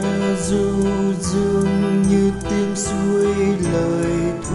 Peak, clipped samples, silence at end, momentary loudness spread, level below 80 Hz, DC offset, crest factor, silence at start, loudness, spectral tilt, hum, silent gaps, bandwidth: -6 dBFS; under 0.1%; 0 s; 4 LU; -36 dBFS; under 0.1%; 12 dB; 0 s; -19 LUFS; -6 dB/octave; none; none; 11.5 kHz